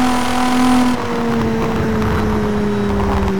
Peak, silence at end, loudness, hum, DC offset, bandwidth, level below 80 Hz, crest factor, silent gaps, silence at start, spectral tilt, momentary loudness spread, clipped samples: -6 dBFS; 0 s; -16 LUFS; none; 4%; 19 kHz; -28 dBFS; 10 dB; none; 0 s; -6 dB/octave; 4 LU; under 0.1%